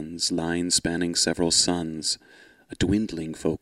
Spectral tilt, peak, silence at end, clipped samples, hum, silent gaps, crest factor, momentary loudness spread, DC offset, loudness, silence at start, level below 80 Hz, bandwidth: -3 dB/octave; -6 dBFS; 0.05 s; under 0.1%; none; none; 20 dB; 9 LU; under 0.1%; -24 LUFS; 0 s; -48 dBFS; 13.5 kHz